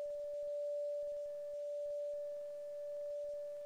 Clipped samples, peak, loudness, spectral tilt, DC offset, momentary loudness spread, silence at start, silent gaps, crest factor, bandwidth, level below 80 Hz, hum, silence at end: under 0.1%; -36 dBFS; -43 LUFS; -3.5 dB/octave; under 0.1%; 5 LU; 0 s; none; 6 dB; 11 kHz; -78 dBFS; none; 0 s